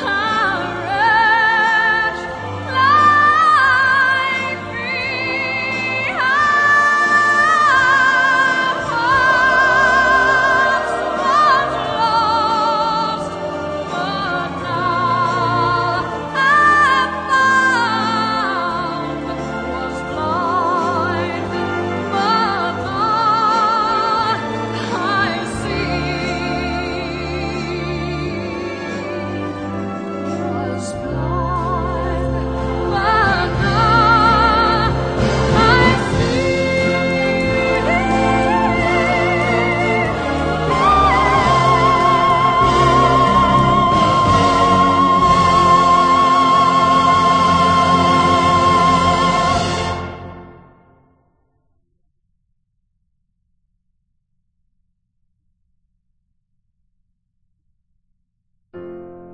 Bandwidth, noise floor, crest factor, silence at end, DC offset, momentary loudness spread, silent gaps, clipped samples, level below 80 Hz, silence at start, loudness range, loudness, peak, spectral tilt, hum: 9.8 kHz; -67 dBFS; 14 dB; 0 s; under 0.1%; 11 LU; none; under 0.1%; -34 dBFS; 0 s; 9 LU; -15 LUFS; -2 dBFS; -5 dB/octave; none